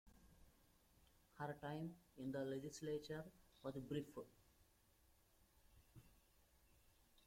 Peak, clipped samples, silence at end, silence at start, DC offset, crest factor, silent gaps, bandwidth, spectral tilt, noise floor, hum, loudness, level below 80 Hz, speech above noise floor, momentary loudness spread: -34 dBFS; under 0.1%; 0 s; 0.05 s; under 0.1%; 20 dB; none; 16.5 kHz; -6 dB/octave; -76 dBFS; none; -51 LUFS; -76 dBFS; 26 dB; 18 LU